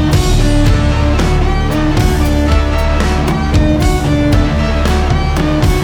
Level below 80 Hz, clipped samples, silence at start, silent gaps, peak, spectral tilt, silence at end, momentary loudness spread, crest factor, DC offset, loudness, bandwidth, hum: -14 dBFS; under 0.1%; 0 s; none; 0 dBFS; -6 dB/octave; 0 s; 2 LU; 10 dB; under 0.1%; -13 LUFS; 17.5 kHz; none